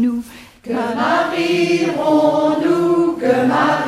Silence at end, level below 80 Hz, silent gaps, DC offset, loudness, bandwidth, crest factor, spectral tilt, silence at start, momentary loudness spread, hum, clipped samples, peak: 0 s; -54 dBFS; none; under 0.1%; -16 LUFS; 14 kHz; 14 dB; -5.5 dB/octave; 0 s; 10 LU; none; under 0.1%; -2 dBFS